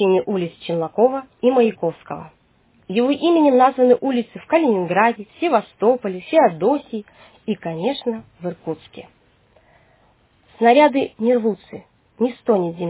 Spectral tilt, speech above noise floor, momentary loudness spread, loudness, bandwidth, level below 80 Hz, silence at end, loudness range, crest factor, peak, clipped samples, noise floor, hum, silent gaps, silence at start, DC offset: -10 dB/octave; 39 dB; 16 LU; -18 LUFS; 4 kHz; -64 dBFS; 0 s; 9 LU; 18 dB; -2 dBFS; under 0.1%; -57 dBFS; none; none; 0 s; under 0.1%